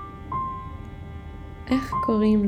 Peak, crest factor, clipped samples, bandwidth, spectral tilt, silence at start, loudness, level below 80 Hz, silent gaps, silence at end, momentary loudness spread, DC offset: -10 dBFS; 16 dB; under 0.1%; 9.4 kHz; -8 dB/octave; 0 s; -26 LUFS; -40 dBFS; none; 0 s; 17 LU; under 0.1%